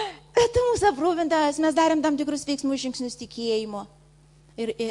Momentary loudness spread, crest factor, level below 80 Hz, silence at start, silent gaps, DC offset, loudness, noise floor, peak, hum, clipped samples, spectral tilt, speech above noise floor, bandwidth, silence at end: 11 LU; 16 dB; -52 dBFS; 0 s; none; under 0.1%; -24 LUFS; -55 dBFS; -8 dBFS; none; under 0.1%; -4 dB/octave; 30 dB; 11.5 kHz; 0 s